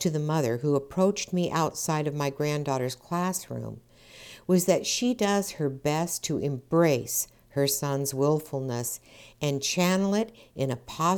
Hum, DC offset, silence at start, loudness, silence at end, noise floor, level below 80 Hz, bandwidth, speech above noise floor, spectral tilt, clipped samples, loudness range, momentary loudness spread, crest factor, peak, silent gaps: none; under 0.1%; 0 s; -27 LUFS; 0 s; -49 dBFS; -60 dBFS; 19.5 kHz; 22 dB; -5 dB/octave; under 0.1%; 2 LU; 9 LU; 18 dB; -8 dBFS; none